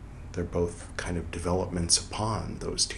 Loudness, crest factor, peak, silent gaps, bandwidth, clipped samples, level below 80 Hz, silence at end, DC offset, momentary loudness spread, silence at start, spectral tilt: -30 LUFS; 22 dB; -8 dBFS; none; 12.5 kHz; under 0.1%; -44 dBFS; 0 s; under 0.1%; 11 LU; 0 s; -3.5 dB/octave